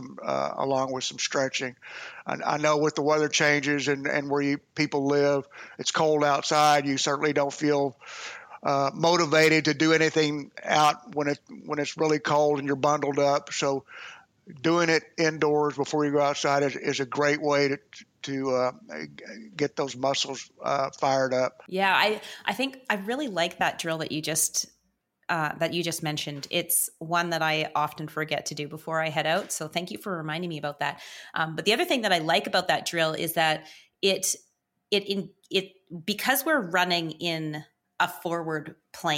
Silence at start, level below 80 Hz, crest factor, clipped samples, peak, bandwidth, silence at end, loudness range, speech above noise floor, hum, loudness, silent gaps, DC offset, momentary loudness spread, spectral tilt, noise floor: 0 s; -74 dBFS; 20 dB; under 0.1%; -6 dBFS; 17 kHz; 0 s; 5 LU; 46 dB; none; -26 LUFS; none; under 0.1%; 11 LU; -3.5 dB/octave; -73 dBFS